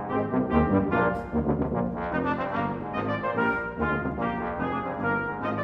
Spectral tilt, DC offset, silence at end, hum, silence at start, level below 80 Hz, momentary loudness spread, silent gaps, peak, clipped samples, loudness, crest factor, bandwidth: -9.5 dB/octave; under 0.1%; 0 s; none; 0 s; -44 dBFS; 6 LU; none; -10 dBFS; under 0.1%; -27 LUFS; 18 dB; 5.8 kHz